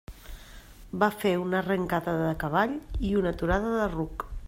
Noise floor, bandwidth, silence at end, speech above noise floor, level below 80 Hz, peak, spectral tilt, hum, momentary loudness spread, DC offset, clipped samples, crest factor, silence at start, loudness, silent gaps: -47 dBFS; 16 kHz; 0 s; 20 dB; -42 dBFS; -10 dBFS; -7 dB/octave; none; 15 LU; under 0.1%; under 0.1%; 18 dB; 0.1 s; -28 LUFS; none